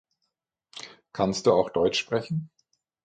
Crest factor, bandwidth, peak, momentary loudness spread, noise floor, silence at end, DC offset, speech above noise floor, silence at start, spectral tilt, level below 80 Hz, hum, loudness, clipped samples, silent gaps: 20 dB; 9.4 kHz; -8 dBFS; 20 LU; -81 dBFS; 0.6 s; under 0.1%; 57 dB; 0.75 s; -5 dB/octave; -60 dBFS; none; -25 LUFS; under 0.1%; none